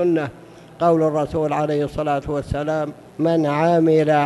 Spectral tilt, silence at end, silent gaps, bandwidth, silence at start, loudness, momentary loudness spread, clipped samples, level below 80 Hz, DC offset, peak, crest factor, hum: -7.5 dB/octave; 0 s; none; 12 kHz; 0 s; -20 LUFS; 8 LU; under 0.1%; -44 dBFS; under 0.1%; -6 dBFS; 14 dB; none